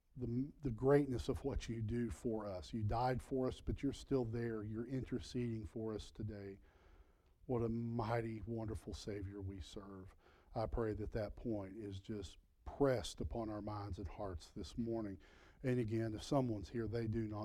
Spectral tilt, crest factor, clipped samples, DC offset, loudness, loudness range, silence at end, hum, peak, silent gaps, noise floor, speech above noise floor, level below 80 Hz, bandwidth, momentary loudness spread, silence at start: -7 dB/octave; 20 dB; under 0.1%; under 0.1%; -42 LUFS; 6 LU; 0 s; none; -20 dBFS; none; -67 dBFS; 26 dB; -56 dBFS; 14 kHz; 11 LU; 0.15 s